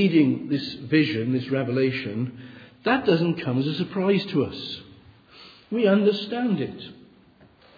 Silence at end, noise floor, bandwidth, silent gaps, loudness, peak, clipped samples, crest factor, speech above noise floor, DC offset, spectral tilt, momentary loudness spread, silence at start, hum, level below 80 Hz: 0.85 s; -54 dBFS; 5 kHz; none; -24 LUFS; -8 dBFS; under 0.1%; 18 dB; 31 dB; under 0.1%; -8.5 dB/octave; 13 LU; 0 s; none; -64 dBFS